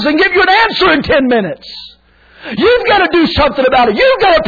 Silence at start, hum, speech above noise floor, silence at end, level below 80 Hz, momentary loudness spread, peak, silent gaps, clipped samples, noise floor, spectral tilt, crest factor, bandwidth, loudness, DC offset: 0 s; none; 34 dB; 0 s; -34 dBFS; 16 LU; 0 dBFS; none; under 0.1%; -44 dBFS; -6 dB/octave; 10 dB; 5 kHz; -10 LUFS; under 0.1%